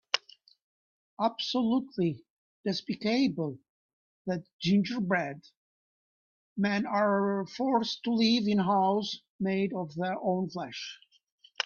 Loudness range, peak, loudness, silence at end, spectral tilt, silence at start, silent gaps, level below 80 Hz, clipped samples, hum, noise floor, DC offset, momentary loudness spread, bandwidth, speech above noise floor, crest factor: 4 LU; -8 dBFS; -30 LUFS; 0.05 s; -6 dB/octave; 0.15 s; 0.62-1.17 s, 2.30-2.64 s, 3.69-4.25 s, 4.53-4.59 s, 5.57-6.56 s, 9.30-9.39 s, 11.32-11.38 s; -72 dBFS; under 0.1%; none; -48 dBFS; under 0.1%; 12 LU; 7.2 kHz; 19 dB; 22 dB